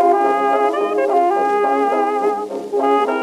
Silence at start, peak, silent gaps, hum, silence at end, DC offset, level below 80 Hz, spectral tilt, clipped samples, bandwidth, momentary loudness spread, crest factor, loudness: 0 s; -4 dBFS; none; none; 0 s; under 0.1%; -70 dBFS; -4.5 dB/octave; under 0.1%; 12.5 kHz; 4 LU; 12 dB; -17 LUFS